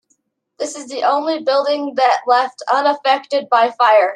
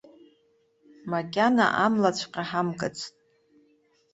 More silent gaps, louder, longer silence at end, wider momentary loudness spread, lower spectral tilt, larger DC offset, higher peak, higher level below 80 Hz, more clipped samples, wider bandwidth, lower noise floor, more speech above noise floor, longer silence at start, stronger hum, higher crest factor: neither; first, -16 LUFS vs -25 LUFS; second, 0 s vs 1.05 s; second, 10 LU vs 15 LU; second, -1.5 dB/octave vs -5 dB/octave; neither; first, -2 dBFS vs -8 dBFS; second, -76 dBFS vs -68 dBFS; neither; first, 10.5 kHz vs 8.2 kHz; about the same, -65 dBFS vs -67 dBFS; first, 49 dB vs 41 dB; second, 0.6 s vs 1.05 s; neither; second, 14 dB vs 20 dB